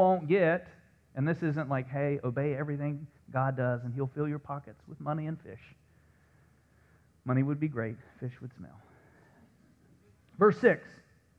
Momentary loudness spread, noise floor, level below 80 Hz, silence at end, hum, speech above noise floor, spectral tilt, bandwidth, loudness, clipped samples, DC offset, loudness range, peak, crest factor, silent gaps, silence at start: 18 LU; -64 dBFS; -68 dBFS; 0.45 s; none; 33 dB; -9.5 dB/octave; 6.6 kHz; -31 LUFS; under 0.1%; under 0.1%; 6 LU; -10 dBFS; 22 dB; none; 0 s